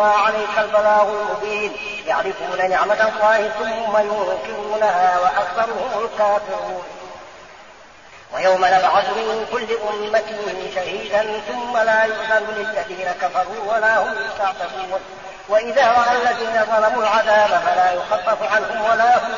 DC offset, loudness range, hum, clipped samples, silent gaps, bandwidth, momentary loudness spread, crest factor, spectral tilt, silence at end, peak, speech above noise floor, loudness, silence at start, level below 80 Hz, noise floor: 0.3%; 4 LU; none; under 0.1%; none; 7.2 kHz; 10 LU; 14 dB; -0.5 dB/octave; 0 s; -4 dBFS; 25 dB; -18 LUFS; 0 s; -56 dBFS; -43 dBFS